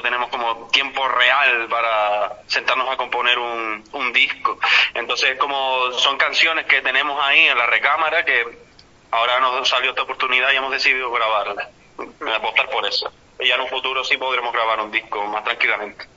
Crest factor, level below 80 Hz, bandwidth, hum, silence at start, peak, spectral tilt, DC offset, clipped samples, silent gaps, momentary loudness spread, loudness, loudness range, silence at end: 18 dB; -60 dBFS; 8 kHz; none; 0 s; 0 dBFS; -0.5 dB/octave; under 0.1%; under 0.1%; none; 9 LU; -18 LUFS; 4 LU; 0.1 s